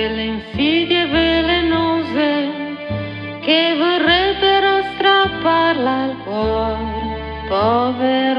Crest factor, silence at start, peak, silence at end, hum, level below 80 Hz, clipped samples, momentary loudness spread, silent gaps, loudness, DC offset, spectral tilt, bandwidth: 16 dB; 0 s; 0 dBFS; 0 s; none; -36 dBFS; under 0.1%; 11 LU; none; -17 LUFS; under 0.1%; -7 dB/octave; 5.6 kHz